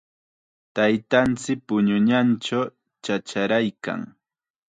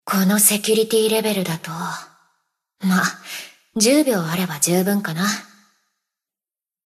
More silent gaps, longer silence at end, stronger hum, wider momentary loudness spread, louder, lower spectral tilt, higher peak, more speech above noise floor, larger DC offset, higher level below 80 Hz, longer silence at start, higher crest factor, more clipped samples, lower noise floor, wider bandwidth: neither; second, 0.65 s vs 1.45 s; neither; about the same, 13 LU vs 15 LU; second, -23 LUFS vs -19 LUFS; first, -5.5 dB/octave vs -3.5 dB/octave; second, -4 dBFS vs 0 dBFS; second, 65 dB vs over 71 dB; neither; first, -60 dBFS vs -70 dBFS; first, 0.75 s vs 0.05 s; about the same, 20 dB vs 20 dB; neither; second, -86 dBFS vs under -90 dBFS; second, 9.2 kHz vs 13.5 kHz